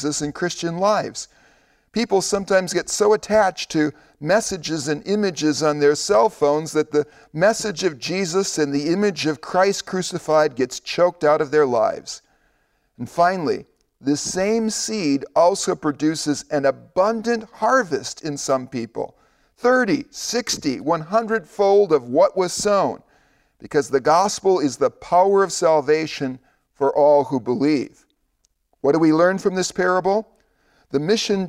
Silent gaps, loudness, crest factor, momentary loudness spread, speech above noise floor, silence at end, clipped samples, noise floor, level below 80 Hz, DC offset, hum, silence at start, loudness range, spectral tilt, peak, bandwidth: none; -20 LUFS; 14 dB; 9 LU; 48 dB; 0 s; under 0.1%; -67 dBFS; -58 dBFS; under 0.1%; none; 0 s; 3 LU; -4 dB/octave; -6 dBFS; 15.5 kHz